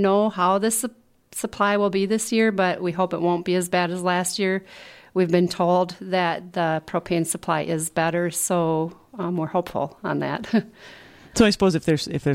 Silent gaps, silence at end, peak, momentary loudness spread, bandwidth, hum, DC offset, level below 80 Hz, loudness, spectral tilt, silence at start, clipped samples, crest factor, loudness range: none; 0 s; -4 dBFS; 9 LU; 16.5 kHz; none; under 0.1%; -54 dBFS; -23 LUFS; -4.5 dB/octave; 0 s; under 0.1%; 18 dB; 2 LU